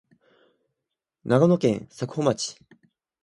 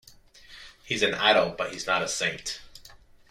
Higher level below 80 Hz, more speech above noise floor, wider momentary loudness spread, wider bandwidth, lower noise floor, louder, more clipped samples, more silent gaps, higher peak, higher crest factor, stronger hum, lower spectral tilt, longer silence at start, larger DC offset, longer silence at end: second, -64 dBFS vs -58 dBFS; first, 62 dB vs 26 dB; second, 13 LU vs 23 LU; second, 11.5 kHz vs 16.5 kHz; first, -85 dBFS vs -52 dBFS; about the same, -24 LUFS vs -25 LUFS; neither; neither; about the same, -6 dBFS vs -8 dBFS; about the same, 22 dB vs 22 dB; neither; first, -6 dB/octave vs -2 dB/octave; first, 1.25 s vs 0.5 s; neither; first, 0.7 s vs 0.35 s